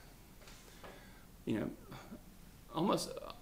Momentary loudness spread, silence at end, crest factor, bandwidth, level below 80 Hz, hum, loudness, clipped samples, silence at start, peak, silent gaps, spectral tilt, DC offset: 22 LU; 0 s; 22 dB; 16 kHz; -60 dBFS; none; -40 LUFS; under 0.1%; 0 s; -20 dBFS; none; -5 dB/octave; under 0.1%